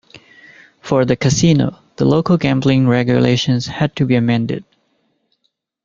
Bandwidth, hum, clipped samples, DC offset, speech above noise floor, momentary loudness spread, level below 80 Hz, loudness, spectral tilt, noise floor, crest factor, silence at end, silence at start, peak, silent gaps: 7.6 kHz; none; under 0.1%; under 0.1%; 54 dB; 7 LU; -46 dBFS; -15 LUFS; -6 dB/octave; -68 dBFS; 16 dB; 1.25 s; 0.15 s; 0 dBFS; none